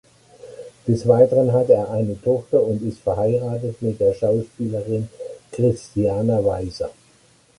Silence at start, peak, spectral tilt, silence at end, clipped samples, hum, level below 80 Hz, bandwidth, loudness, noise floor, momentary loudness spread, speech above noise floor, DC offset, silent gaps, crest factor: 0.45 s; -2 dBFS; -8.5 dB/octave; 0.7 s; under 0.1%; none; -48 dBFS; 11.5 kHz; -20 LUFS; -55 dBFS; 15 LU; 36 dB; under 0.1%; none; 18 dB